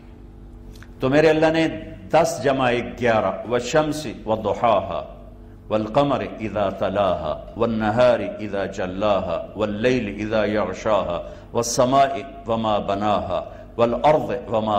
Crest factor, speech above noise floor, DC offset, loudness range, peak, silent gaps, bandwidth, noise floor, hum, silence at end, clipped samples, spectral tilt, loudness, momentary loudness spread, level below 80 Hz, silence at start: 18 dB; 20 dB; under 0.1%; 3 LU; -4 dBFS; none; 15.5 kHz; -41 dBFS; none; 0 s; under 0.1%; -5.5 dB/octave; -21 LUFS; 10 LU; -44 dBFS; 0 s